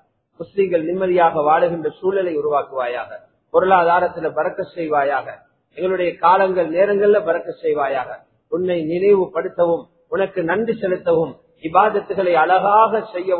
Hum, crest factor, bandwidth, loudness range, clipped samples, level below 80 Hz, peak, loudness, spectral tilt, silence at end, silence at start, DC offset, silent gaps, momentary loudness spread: none; 18 dB; 4.4 kHz; 2 LU; under 0.1%; -60 dBFS; 0 dBFS; -18 LUFS; -10.5 dB/octave; 0 s; 0.4 s; under 0.1%; none; 11 LU